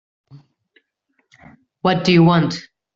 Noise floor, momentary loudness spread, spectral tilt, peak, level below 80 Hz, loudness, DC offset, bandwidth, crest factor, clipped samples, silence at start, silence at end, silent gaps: -68 dBFS; 11 LU; -7 dB/octave; -2 dBFS; -56 dBFS; -16 LUFS; under 0.1%; 7.4 kHz; 18 dB; under 0.1%; 1.85 s; 0.35 s; none